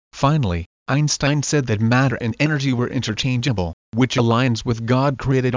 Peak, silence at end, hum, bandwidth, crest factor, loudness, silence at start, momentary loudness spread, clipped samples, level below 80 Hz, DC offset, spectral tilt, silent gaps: -4 dBFS; 0 s; none; 7.6 kHz; 16 dB; -20 LUFS; 0.15 s; 6 LU; under 0.1%; -40 dBFS; under 0.1%; -5.5 dB/octave; 0.66-0.86 s, 3.73-3.92 s